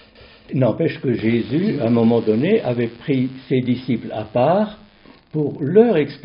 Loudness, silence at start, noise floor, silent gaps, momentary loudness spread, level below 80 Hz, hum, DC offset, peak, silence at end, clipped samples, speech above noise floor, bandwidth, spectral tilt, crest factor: -19 LUFS; 0.5 s; -47 dBFS; none; 8 LU; -56 dBFS; none; under 0.1%; -2 dBFS; 0.05 s; under 0.1%; 30 dB; 5.4 kHz; -7 dB/octave; 18 dB